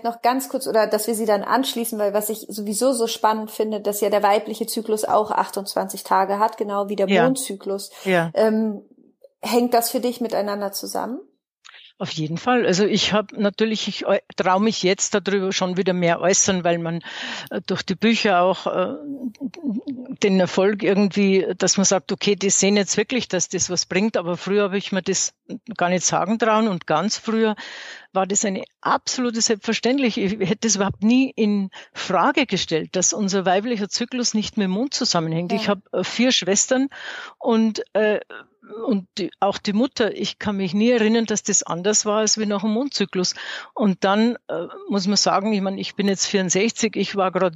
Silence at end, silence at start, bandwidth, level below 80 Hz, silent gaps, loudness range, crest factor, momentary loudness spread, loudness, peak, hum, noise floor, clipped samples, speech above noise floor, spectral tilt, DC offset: 0 s; 0.05 s; 15.5 kHz; -64 dBFS; 11.51-11.55 s; 3 LU; 18 dB; 9 LU; -21 LUFS; -4 dBFS; none; -53 dBFS; under 0.1%; 32 dB; -3.5 dB/octave; under 0.1%